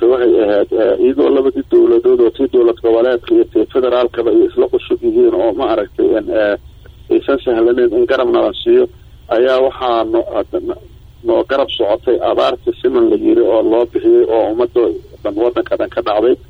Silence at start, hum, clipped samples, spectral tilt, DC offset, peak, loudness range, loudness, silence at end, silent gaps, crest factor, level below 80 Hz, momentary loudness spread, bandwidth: 0 s; none; under 0.1%; -7.5 dB/octave; under 0.1%; -2 dBFS; 3 LU; -13 LUFS; 0.15 s; none; 10 dB; -42 dBFS; 6 LU; 5.2 kHz